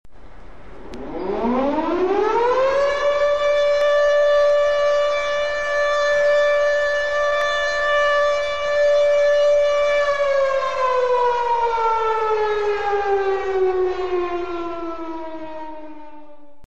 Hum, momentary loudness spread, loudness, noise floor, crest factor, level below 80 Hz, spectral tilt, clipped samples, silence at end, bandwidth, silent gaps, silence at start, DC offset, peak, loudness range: none; 12 LU; -19 LUFS; -46 dBFS; 10 dB; -46 dBFS; -3.5 dB/octave; under 0.1%; 0.5 s; 8.4 kHz; none; 0.25 s; 2%; -8 dBFS; 5 LU